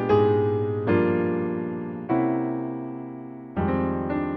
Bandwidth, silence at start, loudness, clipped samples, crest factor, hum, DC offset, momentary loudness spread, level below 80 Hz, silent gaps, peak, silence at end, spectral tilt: 5.8 kHz; 0 s; -25 LUFS; under 0.1%; 16 dB; none; under 0.1%; 12 LU; -52 dBFS; none; -8 dBFS; 0 s; -10.5 dB/octave